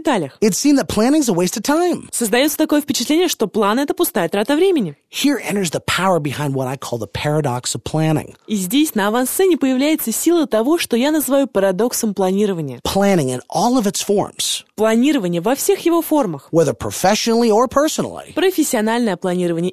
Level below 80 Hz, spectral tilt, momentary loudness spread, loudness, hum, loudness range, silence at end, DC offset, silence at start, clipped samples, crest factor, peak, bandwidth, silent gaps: -48 dBFS; -4.5 dB/octave; 5 LU; -17 LUFS; none; 3 LU; 0 s; 0.2%; 0 s; under 0.1%; 16 dB; -2 dBFS; 15 kHz; none